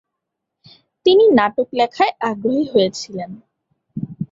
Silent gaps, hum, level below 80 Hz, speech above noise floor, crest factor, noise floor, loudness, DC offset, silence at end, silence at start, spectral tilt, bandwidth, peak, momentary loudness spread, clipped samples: none; none; -60 dBFS; 63 dB; 16 dB; -79 dBFS; -17 LUFS; under 0.1%; 0.05 s; 1.05 s; -5.5 dB/octave; 7.8 kHz; -2 dBFS; 18 LU; under 0.1%